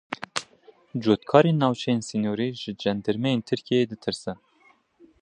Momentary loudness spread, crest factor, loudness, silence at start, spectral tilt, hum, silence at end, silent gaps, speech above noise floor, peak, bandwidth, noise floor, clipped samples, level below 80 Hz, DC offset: 14 LU; 24 dB; -25 LUFS; 0.1 s; -6 dB/octave; none; 0.85 s; none; 37 dB; -2 dBFS; 11 kHz; -61 dBFS; under 0.1%; -62 dBFS; under 0.1%